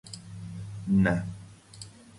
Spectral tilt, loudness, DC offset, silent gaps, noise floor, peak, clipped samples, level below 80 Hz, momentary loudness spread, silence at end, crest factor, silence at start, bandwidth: -7 dB/octave; -28 LUFS; under 0.1%; none; -48 dBFS; -12 dBFS; under 0.1%; -50 dBFS; 22 LU; 0 s; 20 dB; 0.05 s; 11.5 kHz